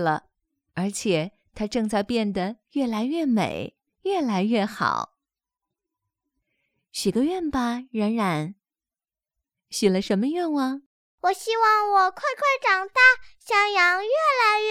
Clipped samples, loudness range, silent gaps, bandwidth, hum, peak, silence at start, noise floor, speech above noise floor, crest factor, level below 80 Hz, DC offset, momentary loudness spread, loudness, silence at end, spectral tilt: under 0.1%; 9 LU; 10.86-11.18 s; 15.5 kHz; none; -4 dBFS; 0 s; under -90 dBFS; over 67 dB; 20 dB; -58 dBFS; under 0.1%; 12 LU; -23 LUFS; 0 s; -4.5 dB/octave